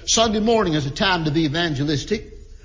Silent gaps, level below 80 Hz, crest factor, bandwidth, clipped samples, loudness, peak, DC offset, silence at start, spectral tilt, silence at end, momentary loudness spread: none; -40 dBFS; 14 dB; 7.6 kHz; under 0.1%; -20 LUFS; -6 dBFS; under 0.1%; 0 s; -4 dB/octave; 0.1 s; 6 LU